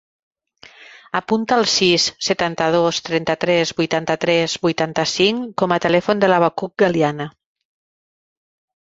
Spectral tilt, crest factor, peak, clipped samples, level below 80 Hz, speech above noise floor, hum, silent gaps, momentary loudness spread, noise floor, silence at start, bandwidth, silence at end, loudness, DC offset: -4 dB/octave; 18 dB; -2 dBFS; under 0.1%; -58 dBFS; 29 dB; none; none; 6 LU; -47 dBFS; 0.8 s; 8 kHz; 1.6 s; -18 LUFS; under 0.1%